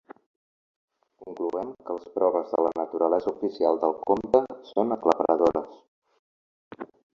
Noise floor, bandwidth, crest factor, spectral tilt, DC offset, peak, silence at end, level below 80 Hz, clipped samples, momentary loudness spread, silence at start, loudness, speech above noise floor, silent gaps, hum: under -90 dBFS; 7.4 kHz; 24 dB; -7 dB/octave; under 0.1%; -4 dBFS; 0.35 s; -64 dBFS; under 0.1%; 14 LU; 1.2 s; -26 LUFS; over 65 dB; 5.88-6.02 s, 6.19-6.71 s; none